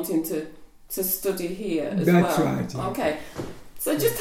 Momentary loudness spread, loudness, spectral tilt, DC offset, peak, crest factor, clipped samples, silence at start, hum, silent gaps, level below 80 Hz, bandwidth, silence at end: 15 LU; -25 LUFS; -5.5 dB/octave; under 0.1%; -6 dBFS; 18 dB; under 0.1%; 0 s; none; none; -50 dBFS; 17 kHz; 0 s